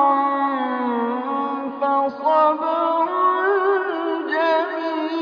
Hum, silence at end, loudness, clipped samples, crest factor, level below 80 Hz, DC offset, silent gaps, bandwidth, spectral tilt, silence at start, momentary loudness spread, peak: none; 0 s; -20 LUFS; under 0.1%; 14 dB; -80 dBFS; under 0.1%; none; 5.4 kHz; -5.5 dB/octave; 0 s; 6 LU; -6 dBFS